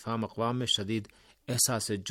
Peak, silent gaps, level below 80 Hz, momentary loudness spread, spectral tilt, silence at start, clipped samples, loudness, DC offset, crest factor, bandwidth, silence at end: -12 dBFS; none; -66 dBFS; 9 LU; -3 dB/octave; 0 s; under 0.1%; -30 LUFS; under 0.1%; 20 dB; 17.5 kHz; 0 s